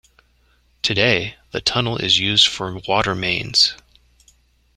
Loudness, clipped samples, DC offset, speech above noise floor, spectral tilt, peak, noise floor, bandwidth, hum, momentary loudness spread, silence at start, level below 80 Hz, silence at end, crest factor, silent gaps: -17 LUFS; under 0.1%; under 0.1%; 40 dB; -3 dB/octave; 0 dBFS; -59 dBFS; 13.5 kHz; none; 8 LU; 0.85 s; -48 dBFS; 1 s; 20 dB; none